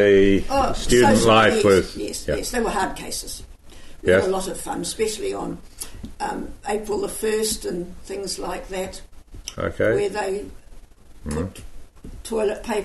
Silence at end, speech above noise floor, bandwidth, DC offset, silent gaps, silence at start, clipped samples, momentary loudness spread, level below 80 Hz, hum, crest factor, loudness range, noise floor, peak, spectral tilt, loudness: 0 s; 21 dB; 12.5 kHz; under 0.1%; none; 0 s; under 0.1%; 19 LU; -36 dBFS; none; 18 dB; 8 LU; -42 dBFS; -4 dBFS; -4.5 dB/octave; -22 LUFS